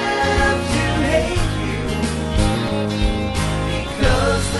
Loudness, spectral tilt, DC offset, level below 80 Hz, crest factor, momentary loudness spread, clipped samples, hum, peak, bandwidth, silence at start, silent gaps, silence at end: -19 LUFS; -5 dB/octave; under 0.1%; -26 dBFS; 14 dB; 5 LU; under 0.1%; none; -4 dBFS; 12 kHz; 0 s; none; 0 s